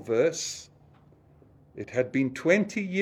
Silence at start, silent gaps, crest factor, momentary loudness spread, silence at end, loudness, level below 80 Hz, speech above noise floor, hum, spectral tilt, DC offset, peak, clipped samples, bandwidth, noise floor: 0 s; none; 22 dB; 12 LU; 0 s; -27 LUFS; -66 dBFS; 30 dB; none; -4.5 dB/octave; under 0.1%; -8 dBFS; under 0.1%; 14 kHz; -57 dBFS